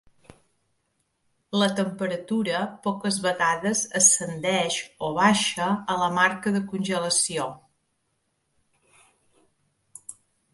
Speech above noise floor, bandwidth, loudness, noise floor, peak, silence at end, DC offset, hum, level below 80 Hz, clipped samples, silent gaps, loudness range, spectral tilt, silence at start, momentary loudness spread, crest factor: 50 dB; 12 kHz; -23 LUFS; -74 dBFS; -6 dBFS; 0.4 s; under 0.1%; none; -68 dBFS; under 0.1%; none; 8 LU; -2.5 dB/octave; 1.5 s; 11 LU; 22 dB